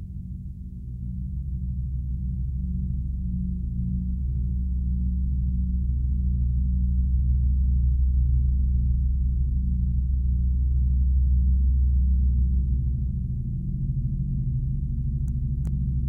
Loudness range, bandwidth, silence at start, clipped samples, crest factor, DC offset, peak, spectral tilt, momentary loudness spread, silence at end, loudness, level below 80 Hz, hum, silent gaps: 6 LU; 0.4 kHz; 0 s; under 0.1%; 10 dB; under 0.1%; -14 dBFS; -13 dB/octave; 8 LU; 0 s; -26 LUFS; -24 dBFS; none; none